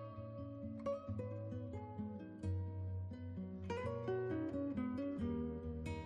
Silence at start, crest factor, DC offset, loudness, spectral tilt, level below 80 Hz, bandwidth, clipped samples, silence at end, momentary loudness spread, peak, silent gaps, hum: 0 s; 12 dB; under 0.1%; -44 LUFS; -9 dB/octave; -60 dBFS; 9.6 kHz; under 0.1%; 0 s; 7 LU; -32 dBFS; none; none